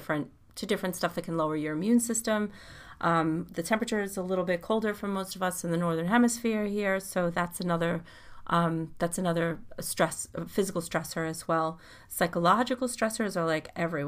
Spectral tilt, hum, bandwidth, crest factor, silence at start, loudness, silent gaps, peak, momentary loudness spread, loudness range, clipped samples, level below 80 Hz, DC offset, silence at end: -5 dB/octave; none; 15.5 kHz; 20 dB; 0 s; -29 LUFS; none; -10 dBFS; 8 LU; 2 LU; under 0.1%; -58 dBFS; under 0.1%; 0 s